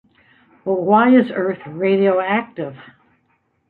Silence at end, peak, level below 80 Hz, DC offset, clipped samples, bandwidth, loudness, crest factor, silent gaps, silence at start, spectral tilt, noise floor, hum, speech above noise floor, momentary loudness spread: 0.9 s; -2 dBFS; -66 dBFS; under 0.1%; under 0.1%; 4.3 kHz; -17 LUFS; 16 dB; none; 0.65 s; -10 dB/octave; -65 dBFS; none; 48 dB; 17 LU